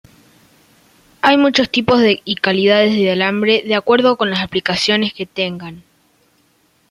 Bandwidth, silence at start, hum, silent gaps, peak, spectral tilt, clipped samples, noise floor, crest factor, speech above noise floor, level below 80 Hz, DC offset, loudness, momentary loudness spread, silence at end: 13.5 kHz; 1.25 s; none; none; 0 dBFS; -5 dB/octave; under 0.1%; -58 dBFS; 16 dB; 43 dB; -54 dBFS; under 0.1%; -14 LUFS; 9 LU; 1.1 s